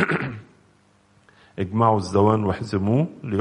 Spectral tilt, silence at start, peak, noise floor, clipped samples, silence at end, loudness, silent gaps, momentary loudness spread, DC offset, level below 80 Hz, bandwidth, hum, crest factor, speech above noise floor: -7.5 dB/octave; 0 s; -4 dBFS; -59 dBFS; under 0.1%; 0 s; -22 LUFS; none; 13 LU; under 0.1%; -54 dBFS; 10.5 kHz; none; 18 dB; 38 dB